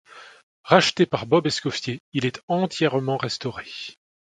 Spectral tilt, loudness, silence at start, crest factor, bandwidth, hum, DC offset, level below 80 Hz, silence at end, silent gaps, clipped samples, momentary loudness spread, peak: -5 dB/octave; -23 LUFS; 0.15 s; 24 dB; 10.5 kHz; none; under 0.1%; -60 dBFS; 0.3 s; 0.43-0.64 s, 2.00-2.12 s, 2.43-2.48 s; under 0.1%; 15 LU; 0 dBFS